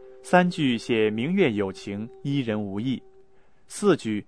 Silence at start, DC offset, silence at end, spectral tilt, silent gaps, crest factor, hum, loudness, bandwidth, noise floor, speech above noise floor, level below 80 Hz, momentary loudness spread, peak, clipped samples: 0 s; 0.2%; 0.05 s; -6 dB/octave; none; 20 dB; none; -25 LUFS; 11 kHz; -59 dBFS; 35 dB; -64 dBFS; 12 LU; -4 dBFS; under 0.1%